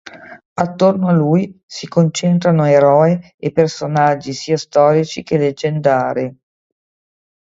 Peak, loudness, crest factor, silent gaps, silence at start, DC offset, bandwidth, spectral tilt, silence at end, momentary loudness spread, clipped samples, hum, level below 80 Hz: 0 dBFS; -15 LUFS; 16 dB; 0.45-0.56 s, 1.63-1.68 s, 3.34-3.38 s; 0.05 s; under 0.1%; 7.8 kHz; -6.5 dB/octave; 1.25 s; 10 LU; under 0.1%; none; -56 dBFS